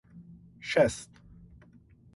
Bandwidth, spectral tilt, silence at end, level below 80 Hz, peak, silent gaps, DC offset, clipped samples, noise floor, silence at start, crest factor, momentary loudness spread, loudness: 11.5 kHz; -4.5 dB/octave; 1.1 s; -56 dBFS; -12 dBFS; none; under 0.1%; under 0.1%; -58 dBFS; 0.15 s; 22 dB; 26 LU; -27 LUFS